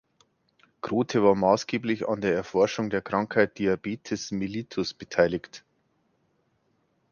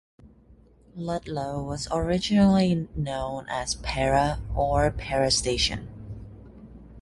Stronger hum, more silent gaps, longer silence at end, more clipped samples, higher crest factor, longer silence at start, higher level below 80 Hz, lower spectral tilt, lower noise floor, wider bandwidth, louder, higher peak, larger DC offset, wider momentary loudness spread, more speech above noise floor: neither; neither; first, 1.55 s vs 0 s; neither; about the same, 22 dB vs 18 dB; first, 0.85 s vs 0.25 s; second, -60 dBFS vs -40 dBFS; about the same, -5.5 dB/octave vs -5 dB/octave; first, -71 dBFS vs -55 dBFS; second, 7.2 kHz vs 11.5 kHz; about the same, -26 LUFS vs -25 LUFS; about the same, -6 dBFS vs -8 dBFS; neither; second, 9 LU vs 18 LU; first, 45 dB vs 30 dB